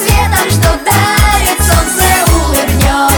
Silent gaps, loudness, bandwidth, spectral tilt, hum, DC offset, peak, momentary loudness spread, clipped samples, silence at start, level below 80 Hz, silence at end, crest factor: none; -9 LUFS; over 20 kHz; -3.5 dB/octave; none; under 0.1%; 0 dBFS; 2 LU; under 0.1%; 0 s; -16 dBFS; 0 s; 10 dB